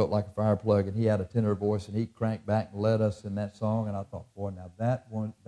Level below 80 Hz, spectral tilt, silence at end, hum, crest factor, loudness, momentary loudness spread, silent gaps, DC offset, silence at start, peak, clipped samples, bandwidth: -60 dBFS; -9 dB/octave; 0.15 s; none; 18 dB; -30 LUFS; 11 LU; none; under 0.1%; 0 s; -12 dBFS; under 0.1%; 10 kHz